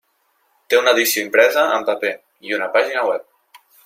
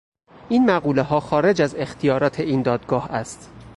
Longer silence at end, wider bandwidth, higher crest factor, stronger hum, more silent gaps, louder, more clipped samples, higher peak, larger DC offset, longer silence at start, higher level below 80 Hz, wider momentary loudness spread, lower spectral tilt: first, 0.65 s vs 0.05 s; first, 16.5 kHz vs 11.5 kHz; about the same, 18 dB vs 14 dB; neither; neither; first, -17 LUFS vs -21 LUFS; neither; first, -2 dBFS vs -6 dBFS; neither; first, 0.7 s vs 0.45 s; second, -72 dBFS vs -52 dBFS; about the same, 11 LU vs 10 LU; second, -1 dB/octave vs -6.5 dB/octave